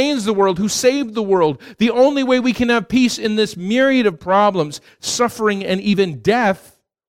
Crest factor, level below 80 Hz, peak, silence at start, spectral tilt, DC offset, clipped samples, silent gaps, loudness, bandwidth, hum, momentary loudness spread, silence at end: 14 dB; -50 dBFS; -2 dBFS; 0 s; -4.5 dB/octave; under 0.1%; under 0.1%; none; -17 LUFS; 16 kHz; none; 5 LU; 0.5 s